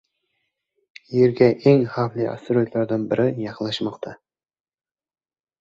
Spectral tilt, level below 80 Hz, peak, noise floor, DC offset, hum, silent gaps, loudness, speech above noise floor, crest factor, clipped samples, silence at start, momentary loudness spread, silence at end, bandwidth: -8 dB/octave; -60 dBFS; -4 dBFS; under -90 dBFS; under 0.1%; none; none; -21 LUFS; over 70 dB; 20 dB; under 0.1%; 1.1 s; 11 LU; 1.45 s; 7.6 kHz